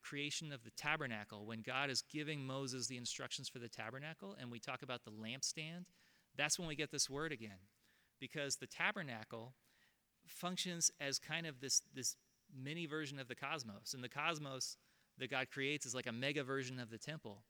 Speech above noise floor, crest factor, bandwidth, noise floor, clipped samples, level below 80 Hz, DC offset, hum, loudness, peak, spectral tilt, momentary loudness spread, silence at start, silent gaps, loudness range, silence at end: 32 dB; 24 dB; over 20 kHz; -77 dBFS; under 0.1%; -78 dBFS; under 0.1%; none; -43 LUFS; -22 dBFS; -2.5 dB/octave; 12 LU; 0.05 s; none; 5 LU; 0.1 s